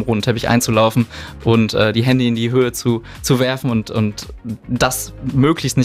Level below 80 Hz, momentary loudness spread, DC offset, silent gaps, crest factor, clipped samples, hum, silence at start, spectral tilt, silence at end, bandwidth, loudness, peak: -40 dBFS; 8 LU; under 0.1%; none; 16 dB; under 0.1%; none; 0 s; -5.5 dB/octave; 0 s; 16 kHz; -17 LUFS; -2 dBFS